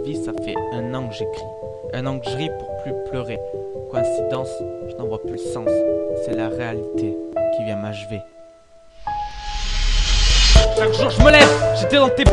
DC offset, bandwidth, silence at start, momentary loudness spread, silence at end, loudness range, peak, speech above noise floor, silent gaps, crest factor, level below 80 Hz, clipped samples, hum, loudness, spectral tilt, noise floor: under 0.1%; 11 kHz; 0 s; 16 LU; 0 s; 11 LU; 0 dBFS; 27 dB; none; 18 dB; -24 dBFS; under 0.1%; none; -19 LUFS; -4.5 dB/octave; -47 dBFS